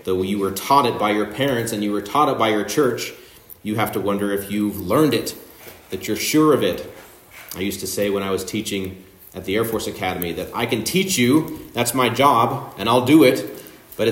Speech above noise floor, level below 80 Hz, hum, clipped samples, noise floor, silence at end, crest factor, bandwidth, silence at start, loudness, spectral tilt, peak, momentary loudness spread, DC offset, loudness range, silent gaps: 23 dB; -54 dBFS; none; under 0.1%; -43 dBFS; 0 s; 18 dB; 16.5 kHz; 0.05 s; -20 LUFS; -4.5 dB/octave; -2 dBFS; 15 LU; under 0.1%; 7 LU; none